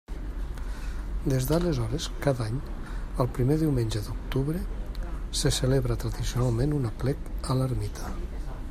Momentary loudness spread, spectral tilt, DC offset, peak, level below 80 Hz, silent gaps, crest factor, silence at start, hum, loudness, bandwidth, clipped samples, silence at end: 12 LU; -6 dB/octave; under 0.1%; -10 dBFS; -34 dBFS; none; 18 dB; 0.1 s; none; -29 LUFS; 15.5 kHz; under 0.1%; 0 s